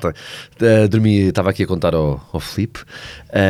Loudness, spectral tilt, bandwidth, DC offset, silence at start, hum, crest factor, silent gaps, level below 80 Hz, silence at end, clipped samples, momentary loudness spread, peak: -17 LUFS; -7 dB/octave; 14.5 kHz; under 0.1%; 0 s; none; 14 dB; none; -38 dBFS; 0 s; under 0.1%; 20 LU; -2 dBFS